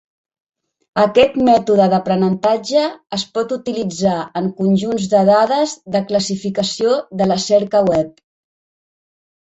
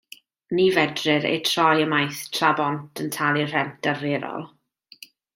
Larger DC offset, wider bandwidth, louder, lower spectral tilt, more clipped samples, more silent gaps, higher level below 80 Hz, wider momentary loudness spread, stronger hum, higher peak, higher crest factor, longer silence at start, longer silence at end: neither; second, 8.2 kHz vs 16.5 kHz; first, -16 LUFS vs -22 LUFS; about the same, -5.5 dB/octave vs -4.5 dB/octave; neither; neither; first, -54 dBFS vs -68 dBFS; about the same, 9 LU vs 11 LU; neither; about the same, -2 dBFS vs -2 dBFS; about the same, 16 dB vs 20 dB; first, 0.95 s vs 0.5 s; first, 1.45 s vs 0.9 s